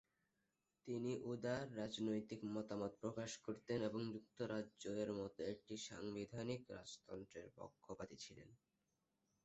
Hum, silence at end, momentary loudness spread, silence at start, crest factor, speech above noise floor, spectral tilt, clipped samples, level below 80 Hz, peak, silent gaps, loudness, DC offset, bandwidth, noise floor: none; 0.9 s; 12 LU; 0.85 s; 18 dB; 41 dB; -5.5 dB/octave; under 0.1%; -78 dBFS; -30 dBFS; none; -48 LUFS; under 0.1%; 8 kHz; -89 dBFS